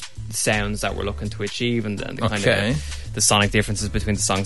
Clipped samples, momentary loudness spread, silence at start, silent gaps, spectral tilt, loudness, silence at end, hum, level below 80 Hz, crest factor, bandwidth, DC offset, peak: under 0.1%; 11 LU; 0 s; none; -3.5 dB/octave; -22 LUFS; 0 s; none; -34 dBFS; 18 dB; 12 kHz; 1%; -4 dBFS